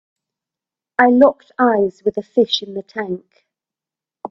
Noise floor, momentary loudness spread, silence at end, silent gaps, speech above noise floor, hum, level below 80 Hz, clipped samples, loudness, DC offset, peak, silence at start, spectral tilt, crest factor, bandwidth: -89 dBFS; 15 LU; 0.05 s; none; 72 dB; none; -62 dBFS; under 0.1%; -17 LUFS; under 0.1%; 0 dBFS; 1 s; -5.5 dB/octave; 18 dB; 7 kHz